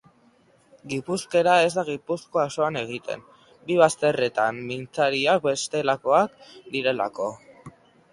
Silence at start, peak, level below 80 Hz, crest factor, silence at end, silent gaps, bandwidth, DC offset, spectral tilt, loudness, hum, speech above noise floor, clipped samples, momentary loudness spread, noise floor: 0.85 s; -4 dBFS; -66 dBFS; 22 dB; 0.45 s; none; 11.5 kHz; under 0.1%; -4 dB/octave; -24 LUFS; none; 36 dB; under 0.1%; 13 LU; -59 dBFS